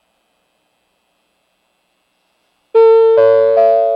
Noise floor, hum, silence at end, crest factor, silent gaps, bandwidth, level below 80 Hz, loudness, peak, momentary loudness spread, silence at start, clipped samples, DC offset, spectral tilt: -63 dBFS; none; 0 s; 14 dB; none; 5.2 kHz; -80 dBFS; -10 LUFS; 0 dBFS; 3 LU; 2.75 s; under 0.1%; under 0.1%; -6 dB/octave